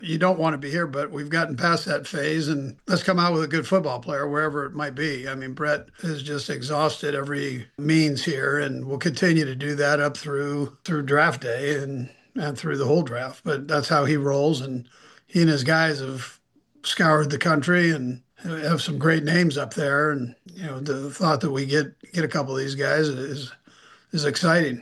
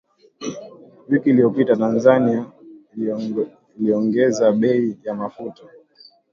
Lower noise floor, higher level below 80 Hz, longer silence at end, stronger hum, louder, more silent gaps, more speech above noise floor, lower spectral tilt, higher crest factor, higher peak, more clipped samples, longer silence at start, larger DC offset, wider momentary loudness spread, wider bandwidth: about the same, -53 dBFS vs -51 dBFS; about the same, -66 dBFS vs -64 dBFS; second, 0 s vs 0.8 s; neither; second, -24 LUFS vs -19 LUFS; neither; about the same, 30 dB vs 33 dB; second, -5.5 dB/octave vs -7 dB/octave; about the same, 18 dB vs 18 dB; second, -6 dBFS vs -2 dBFS; neither; second, 0 s vs 0.4 s; neither; second, 11 LU vs 17 LU; first, 12.5 kHz vs 7.4 kHz